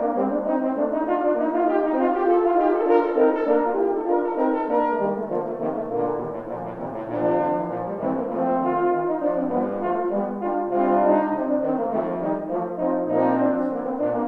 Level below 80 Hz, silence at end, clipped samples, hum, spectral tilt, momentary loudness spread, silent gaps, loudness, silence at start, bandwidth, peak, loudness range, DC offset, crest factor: -58 dBFS; 0 s; under 0.1%; none; -10 dB/octave; 7 LU; none; -23 LUFS; 0 s; 4.5 kHz; -6 dBFS; 5 LU; under 0.1%; 16 dB